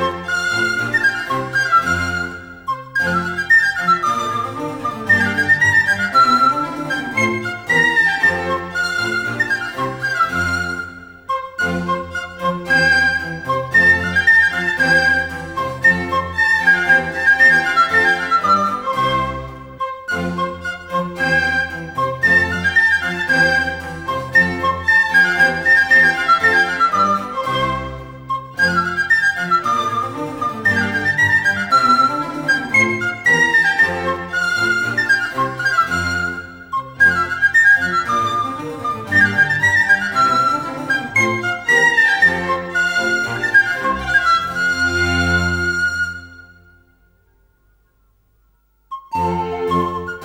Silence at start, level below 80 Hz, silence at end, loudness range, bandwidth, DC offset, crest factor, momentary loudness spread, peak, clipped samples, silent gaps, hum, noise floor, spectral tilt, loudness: 0 s; -44 dBFS; 0 s; 6 LU; 19 kHz; under 0.1%; 14 dB; 12 LU; -2 dBFS; under 0.1%; none; none; -58 dBFS; -4 dB/octave; -15 LUFS